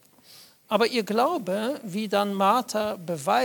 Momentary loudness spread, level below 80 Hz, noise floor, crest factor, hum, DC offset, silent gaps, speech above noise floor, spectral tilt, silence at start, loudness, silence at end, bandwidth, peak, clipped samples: 7 LU; -74 dBFS; -52 dBFS; 18 dB; none; under 0.1%; none; 28 dB; -4.5 dB/octave; 0.3 s; -25 LUFS; 0 s; 19 kHz; -8 dBFS; under 0.1%